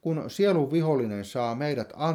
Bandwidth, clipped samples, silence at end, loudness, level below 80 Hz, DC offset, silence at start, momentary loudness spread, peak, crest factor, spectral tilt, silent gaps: 16 kHz; under 0.1%; 0 s; -27 LUFS; -68 dBFS; under 0.1%; 0.05 s; 7 LU; -12 dBFS; 14 dB; -7 dB/octave; none